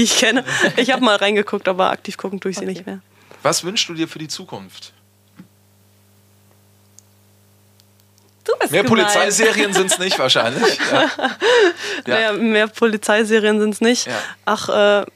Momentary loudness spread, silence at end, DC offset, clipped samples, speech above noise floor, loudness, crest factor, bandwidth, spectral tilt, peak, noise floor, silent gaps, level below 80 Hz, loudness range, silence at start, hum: 13 LU; 0.1 s; under 0.1%; under 0.1%; 37 dB; -16 LUFS; 16 dB; 15.5 kHz; -2.5 dB/octave; -2 dBFS; -54 dBFS; none; -70 dBFS; 11 LU; 0 s; none